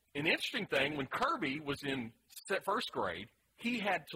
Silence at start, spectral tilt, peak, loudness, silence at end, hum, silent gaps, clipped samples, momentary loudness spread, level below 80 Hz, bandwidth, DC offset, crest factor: 0.15 s; -4 dB/octave; -18 dBFS; -36 LUFS; 0 s; none; none; under 0.1%; 10 LU; -68 dBFS; 16 kHz; under 0.1%; 20 dB